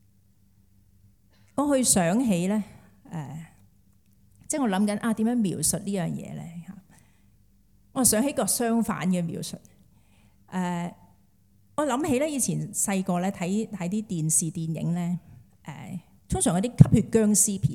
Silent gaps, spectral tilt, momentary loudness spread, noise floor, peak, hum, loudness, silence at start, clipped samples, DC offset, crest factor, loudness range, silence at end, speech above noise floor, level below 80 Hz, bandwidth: none; -5 dB/octave; 19 LU; -62 dBFS; 0 dBFS; none; -25 LUFS; 1.55 s; under 0.1%; under 0.1%; 26 dB; 5 LU; 0 s; 37 dB; -52 dBFS; 17.5 kHz